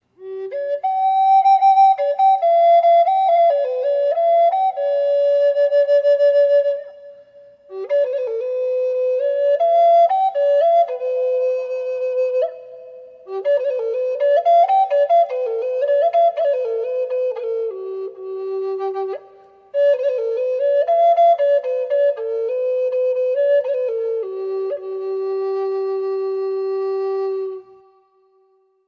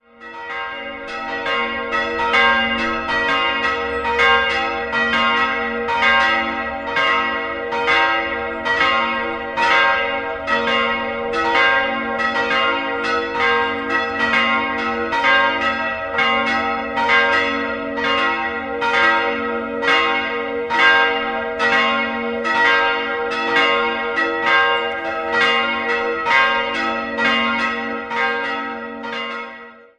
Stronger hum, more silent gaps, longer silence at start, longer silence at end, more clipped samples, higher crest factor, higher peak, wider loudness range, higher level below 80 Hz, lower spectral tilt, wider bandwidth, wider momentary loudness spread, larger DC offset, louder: neither; neither; about the same, 0.2 s vs 0.2 s; first, 1.25 s vs 0.2 s; neither; second, 12 dB vs 18 dB; second, -6 dBFS vs 0 dBFS; first, 8 LU vs 2 LU; second, -80 dBFS vs -48 dBFS; about the same, -4 dB/octave vs -3.5 dB/octave; second, 6 kHz vs 10 kHz; first, 12 LU vs 9 LU; neither; about the same, -18 LUFS vs -17 LUFS